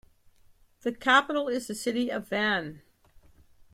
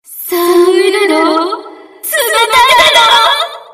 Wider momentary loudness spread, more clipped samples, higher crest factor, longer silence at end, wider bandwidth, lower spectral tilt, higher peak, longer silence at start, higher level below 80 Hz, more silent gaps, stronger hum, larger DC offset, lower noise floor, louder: about the same, 13 LU vs 12 LU; second, under 0.1% vs 0.3%; first, 22 dB vs 10 dB; first, 0.95 s vs 0.1 s; about the same, 16 kHz vs 16 kHz; first, -3.5 dB/octave vs -1 dB/octave; second, -8 dBFS vs 0 dBFS; first, 0.85 s vs 0.1 s; second, -64 dBFS vs -48 dBFS; neither; neither; neither; first, -60 dBFS vs -29 dBFS; second, -27 LUFS vs -8 LUFS